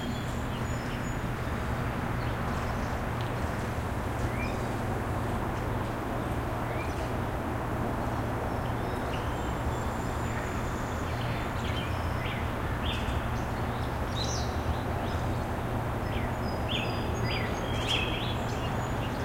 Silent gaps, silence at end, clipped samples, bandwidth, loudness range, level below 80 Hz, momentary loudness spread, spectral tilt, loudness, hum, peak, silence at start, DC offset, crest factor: none; 0 s; under 0.1%; 16 kHz; 2 LU; -38 dBFS; 3 LU; -5.5 dB/octave; -32 LUFS; none; -16 dBFS; 0 s; under 0.1%; 16 dB